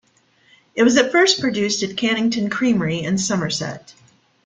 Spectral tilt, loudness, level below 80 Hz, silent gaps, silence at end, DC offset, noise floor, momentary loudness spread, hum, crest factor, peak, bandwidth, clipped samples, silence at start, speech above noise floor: -4 dB/octave; -18 LUFS; -58 dBFS; none; 0.55 s; under 0.1%; -58 dBFS; 10 LU; none; 18 dB; -2 dBFS; 9.6 kHz; under 0.1%; 0.75 s; 39 dB